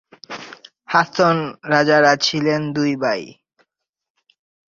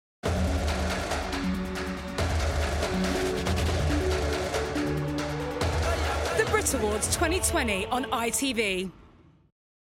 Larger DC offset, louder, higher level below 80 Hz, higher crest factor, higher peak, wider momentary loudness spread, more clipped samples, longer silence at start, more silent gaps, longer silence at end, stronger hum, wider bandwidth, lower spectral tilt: neither; first, -17 LUFS vs -28 LUFS; second, -62 dBFS vs -36 dBFS; about the same, 18 dB vs 18 dB; first, -2 dBFS vs -10 dBFS; first, 20 LU vs 6 LU; neither; about the same, 0.3 s vs 0.25 s; neither; first, 1.4 s vs 0.9 s; neither; second, 7.6 kHz vs 16.5 kHz; about the same, -4.5 dB/octave vs -4 dB/octave